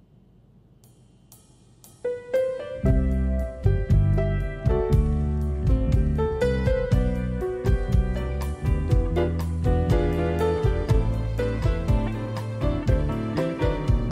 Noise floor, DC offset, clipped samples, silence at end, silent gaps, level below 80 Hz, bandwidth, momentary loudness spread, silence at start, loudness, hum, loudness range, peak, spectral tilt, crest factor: -55 dBFS; under 0.1%; under 0.1%; 0 s; none; -28 dBFS; 12 kHz; 6 LU; 1.3 s; -25 LUFS; none; 2 LU; -10 dBFS; -8.5 dB/octave; 14 dB